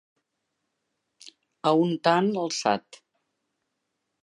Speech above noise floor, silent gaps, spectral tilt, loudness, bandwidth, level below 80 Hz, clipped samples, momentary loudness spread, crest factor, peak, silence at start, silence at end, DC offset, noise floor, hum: 56 dB; none; -5 dB/octave; -25 LUFS; 11 kHz; -78 dBFS; under 0.1%; 6 LU; 22 dB; -6 dBFS; 1.25 s; 1.45 s; under 0.1%; -80 dBFS; none